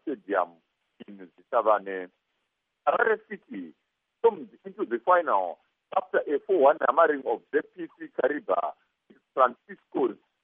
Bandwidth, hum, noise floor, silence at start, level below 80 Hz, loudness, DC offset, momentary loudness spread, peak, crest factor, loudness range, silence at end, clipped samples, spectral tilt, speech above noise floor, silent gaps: 3.8 kHz; none; -79 dBFS; 0.05 s; -86 dBFS; -26 LUFS; under 0.1%; 19 LU; -6 dBFS; 20 dB; 4 LU; 0.3 s; under 0.1%; -3 dB/octave; 53 dB; none